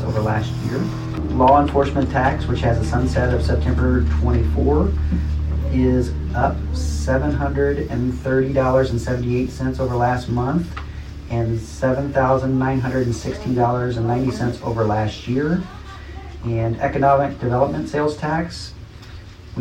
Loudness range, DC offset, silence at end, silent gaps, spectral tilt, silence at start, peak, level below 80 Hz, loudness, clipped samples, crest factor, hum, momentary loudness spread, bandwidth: 3 LU; under 0.1%; 0 s; none; -7.5 dB/octave; 0 s; -2 dBFS; -26 dBFS; -20 LUFS; under 0.1%; 18 dB; none; 9 LU; 9.6 kHz